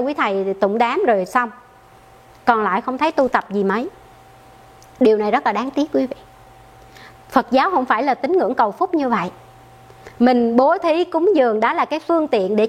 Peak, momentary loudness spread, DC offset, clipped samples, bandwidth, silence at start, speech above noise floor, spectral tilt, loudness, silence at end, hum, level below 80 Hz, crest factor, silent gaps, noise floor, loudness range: 0 dBFS; 6 LU; under 0.1%; under 0.1%; 14 kHz; 0 s; 29 dB; -6 dB/octave; -18 LUFS; 0 s; none; -56 dBFS; 18 dB; none; -47 dBFS; 4 LU